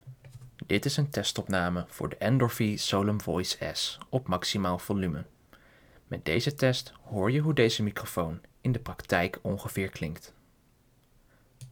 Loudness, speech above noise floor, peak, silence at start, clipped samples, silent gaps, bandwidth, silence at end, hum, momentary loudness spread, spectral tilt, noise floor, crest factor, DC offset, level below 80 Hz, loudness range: -30 LUFS; 35 dB; -12 dBFS; 0.05 s; under 0.1%; none; over 20 kHz; 0 s; none; 11 LU; -5 dB/octave; -64 dBFS; 20 dB; under 0.1%; -56 dBFS; 4 LU